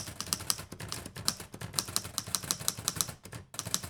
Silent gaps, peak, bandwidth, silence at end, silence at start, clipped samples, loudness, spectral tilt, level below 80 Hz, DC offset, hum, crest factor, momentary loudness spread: none; -4 dBFS; over 20 kHz; 0 s; 0 s; under 0.1%; -34 LUFS; -1.5 dB/octave; -58 dBFS; under 0.1%; none; 32 dB; 9 LU